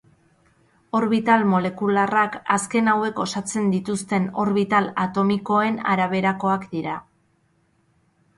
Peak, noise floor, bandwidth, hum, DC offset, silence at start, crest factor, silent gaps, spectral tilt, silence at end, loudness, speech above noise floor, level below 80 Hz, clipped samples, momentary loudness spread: -6 dBFS; -64 dBFS; 11.5 kHz; none; under 0.1%; 0.95 s; 18 dB; none; -5.5 dB/octave; 1.35 s; -21 LUFS; 43 dB; -62 dBFS; under 0.1%; 7 LU